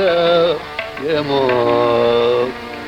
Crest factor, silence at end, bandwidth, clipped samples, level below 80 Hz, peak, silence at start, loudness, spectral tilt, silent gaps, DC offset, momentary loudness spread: 12 dB; 0 s; 10 kHz; under 0.1%; -48 dBFS; -4 dBFS; 0 s; -16 LUFS; -6 dB/octave; none; under 0.1%; 9 LU